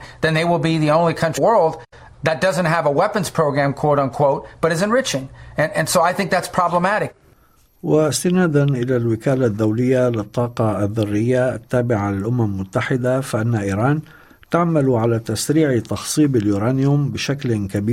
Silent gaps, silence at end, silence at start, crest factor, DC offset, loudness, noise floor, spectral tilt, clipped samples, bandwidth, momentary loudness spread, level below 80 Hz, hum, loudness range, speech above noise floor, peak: none; 0 s; 0 s; 16 dB; under 0.1%; -18 LUFS; -54 dBFS; -6 dB/octave; under 0.1%; 16 kHz; 5 LU; -50 dBFS; none; 2 LU; 36 dB; -2 dBFS